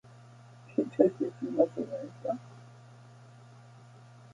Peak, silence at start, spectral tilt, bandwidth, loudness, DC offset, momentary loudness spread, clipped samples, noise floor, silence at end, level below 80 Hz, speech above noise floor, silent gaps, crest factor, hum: -8 dBFS; 0.7 s; -8.5 dB/octave; 10.5 kHz; -31 LUFS; under 0.1%; 27 LU; under 0.1%; -53 dBFS; 0.55 s; -78 dBFS; 23 dB; none; 26 dB; none